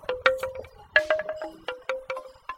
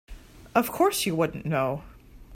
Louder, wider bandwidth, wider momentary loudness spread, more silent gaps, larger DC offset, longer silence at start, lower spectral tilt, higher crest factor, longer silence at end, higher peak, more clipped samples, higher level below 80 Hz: about the same, -28 LUFS vs -26 LUFS; about the same, 16 kHz vs 16.5 kHz; first, 13 LU vs 6 LU; neither; neither; about the same, 0 s vs 0.1 s; second, -2.5 dB/octave vs -4.5 dB/octave; first, 28 dB vs 20 dB; about the same, 0 s vs 0 s; first, -2 dBFS vs -8 dBFS; neither; second, -58 dBFS vs -50 dBFS